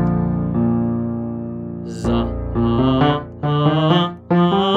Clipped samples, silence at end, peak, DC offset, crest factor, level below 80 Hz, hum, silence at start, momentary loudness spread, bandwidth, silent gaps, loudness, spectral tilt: under 0.1%; 0 s; -2 dBFS; under 0.1%; 16 dB; -34 dBFS; none; 0 s; 10 LU; 8.6 kHz; none; -19 LUFS; -8 dB/octave